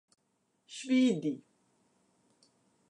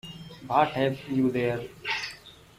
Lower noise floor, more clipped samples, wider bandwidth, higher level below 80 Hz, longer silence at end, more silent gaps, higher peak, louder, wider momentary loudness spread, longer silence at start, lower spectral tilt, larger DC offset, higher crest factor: first, -77 dBFS vs -48 dBFS; neither; second, 10.5 kHz vs 15.5 kHz; second, -88 dBFS vs -60 dBFS; first, 1.55 s vs 0.25 s; neither; second, -18 dBFS vs -8 dBFS; about the same, -30 LUFS vs -28 LUFS; about the same, 18 LU vs 17 LU; first, 0.7 s vs 0.05 s; about the same, -5 dB/octave vs -6 dB/octave; neither; about the same, 18 dB vs 20 dB